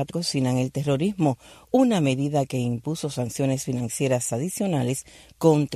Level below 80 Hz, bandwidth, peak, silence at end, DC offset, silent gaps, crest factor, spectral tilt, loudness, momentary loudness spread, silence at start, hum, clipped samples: -58 dBFS; 14 kHz; -6 dBFS; 0 s; under 0.1%; none; 18 dB; -6 dB/octave; -24 LUFS; 8 LU; 0 s; none; under 0.1%